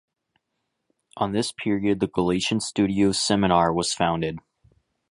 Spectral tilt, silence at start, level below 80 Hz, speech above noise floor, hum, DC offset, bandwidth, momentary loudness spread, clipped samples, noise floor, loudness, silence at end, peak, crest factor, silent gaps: -4.5 dB/octave; 1.15 s; -50 dBFS; 56 dB; none; under 0.1%; 11.5 kHz; 8 LU; under 0.1%; -78 dBFS; -23 LUFS; 0.7 s; -6 dBFS; 20 dB; none